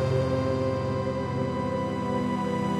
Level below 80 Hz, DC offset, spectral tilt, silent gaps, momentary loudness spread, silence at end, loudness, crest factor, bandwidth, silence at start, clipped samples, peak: -50 dBFS; under 0.1%; -7.5 dB/octave; none; 3 LU; 0 s; -28 LUFS; 12 dB; 11.5 kHz; 0 s; under 0.1%; -14 dBFS